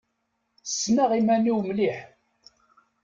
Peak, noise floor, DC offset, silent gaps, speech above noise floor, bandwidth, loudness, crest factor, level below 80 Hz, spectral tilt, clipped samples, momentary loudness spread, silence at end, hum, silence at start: -12 dBFS; -76 dBFS; under 0.1%; none; 53 dB; 7.6 kHz; -24 LUFS; 14 dB; -68 dBFS; -4.5 dB/octave; under 0.1%; 13 LU; 1 s; none; 0.65 s